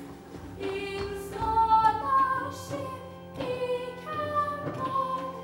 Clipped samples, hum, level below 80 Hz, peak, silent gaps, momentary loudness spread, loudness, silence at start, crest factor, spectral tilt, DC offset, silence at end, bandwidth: under 0.1%; none; -52 dBFS; -10 dBFS; none; 16 LU; -29 LUFS; 0 s; 18 dB; -5.5 dB/octave; under 0.1%; 0 s; 16.5 kHz